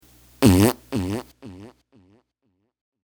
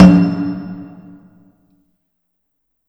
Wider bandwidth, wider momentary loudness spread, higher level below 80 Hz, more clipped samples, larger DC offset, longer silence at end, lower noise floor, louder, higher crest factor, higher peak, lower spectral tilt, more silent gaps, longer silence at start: first, over 20 kHz vs 6.4 kHz; about the same, 26 LU vs 26 LU; second, -44 dBFS vs -38 dBFS; second, under 0.1% vs 0.7%; neither; second, 1.35 s vs 2.05 s; about the same, -73 dBFS vs -71 dBFS; second, -20 LUFS vs -14 LUFS; first, 24 dB vs 16 dB; about the same, 0 dBFS vs 0 dBFS; second, -6 dB/octave vs -8.5 dB/octave; neither; first, 0.4 s vs 0 s